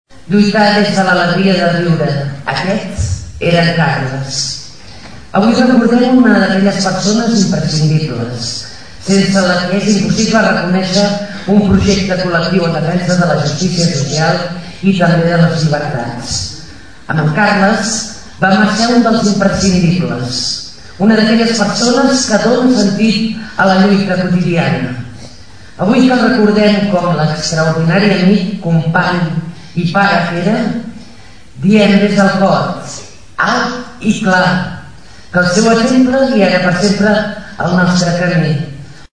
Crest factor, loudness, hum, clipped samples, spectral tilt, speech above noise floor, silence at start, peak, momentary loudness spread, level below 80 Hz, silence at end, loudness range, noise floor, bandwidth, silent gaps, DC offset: 12 dB; -12 LUFS; none; 0.2%; -5.5 dB/octave; 27 dB; 0.05 s; 0 dBFS; 10 LU; -38 dBFS; 0 s; 3 LU; -38 dBFS; 10.5 kHz; none; 2%